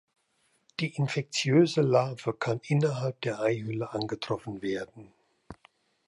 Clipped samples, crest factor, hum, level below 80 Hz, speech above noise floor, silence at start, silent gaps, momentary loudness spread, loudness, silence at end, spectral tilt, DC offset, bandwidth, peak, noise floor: under 0.1%; 20 dB; none; -68 dBFS; 44 dB; 0.8 s; none; 11 LU; -29 LUFS; 0.55 s; -6 dB/octave; under 0.1%; 11.5 kHz; -10 dBFS; -72 dBFS